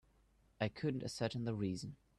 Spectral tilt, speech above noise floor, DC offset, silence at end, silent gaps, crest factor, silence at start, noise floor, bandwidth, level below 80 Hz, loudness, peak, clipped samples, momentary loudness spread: -6 dB/octave; 31 dB; under 0.1%; 0.25 s; none; 18 dB; 0.6 s; -72 dBFS; 12.5 kHz; -68 dBFS; -41 LUFS; -24 dBFS; under 0.1%; 3 LU